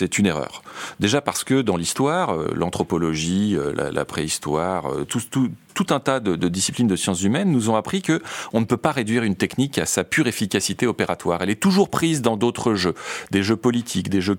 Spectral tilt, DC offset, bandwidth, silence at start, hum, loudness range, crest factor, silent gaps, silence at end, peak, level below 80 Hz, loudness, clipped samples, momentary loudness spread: -4.5 dB/octave; under 0.1%; 17 kHz; 0 s; none; 2 LU; 20 dB; none; 0 s; -2 dBFS; -52 dBFS; -21 LUFS; under 0.1%; 5 LU